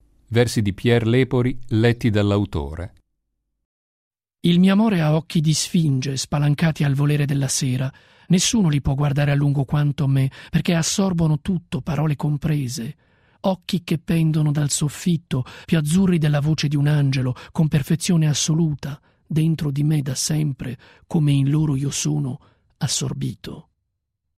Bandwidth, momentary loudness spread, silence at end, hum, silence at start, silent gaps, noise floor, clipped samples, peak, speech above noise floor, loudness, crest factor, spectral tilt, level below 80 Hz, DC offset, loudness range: 15 kHz; 9 LU; 0.75 s; none; 0.3 s; 3.65-4.11 s; -77 dBFS; under 0.1%; -4 dBFS; 57 dB; -20 LUFS; 16 dB; -5.5 dB/octave; -44 dBFS; under 0.1%; 3 LU